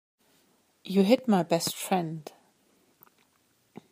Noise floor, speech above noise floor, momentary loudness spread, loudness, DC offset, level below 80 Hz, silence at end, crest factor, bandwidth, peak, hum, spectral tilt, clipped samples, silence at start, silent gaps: -69 dBFS; 43 dB; 21 LU; -26 LUFS; under 0.1%; -78 dBFS; 1.7 s; 22 dB; 15.5 kHz; -8 dBFS; none; -5.5 dB/octave; under 0.1%; 0.85 s; none